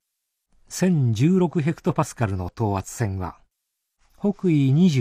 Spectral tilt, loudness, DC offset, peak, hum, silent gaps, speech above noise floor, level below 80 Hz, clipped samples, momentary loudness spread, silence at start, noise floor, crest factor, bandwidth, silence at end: -7 dB/octave; -22 LUFS; under 0.1%; -8 dBFS; none; none; 59 dB; -52 dBFS; under 0.1%; 9 LU; 0.7 s; -79 dBFS; 14 dB; 15 kHz; 0 s